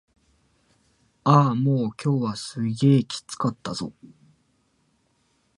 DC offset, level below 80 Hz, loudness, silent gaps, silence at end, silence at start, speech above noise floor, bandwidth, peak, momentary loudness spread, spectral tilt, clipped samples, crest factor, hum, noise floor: under 0.1%; -64 dBFS; -23 LUFS; none; 1.5 s; 1.25 s; 45 dB; 11.5 kHz; -2 dBFS; 13 LU; -7 dB/octave; under 0.1%; 22 dB; none; -68 dBFS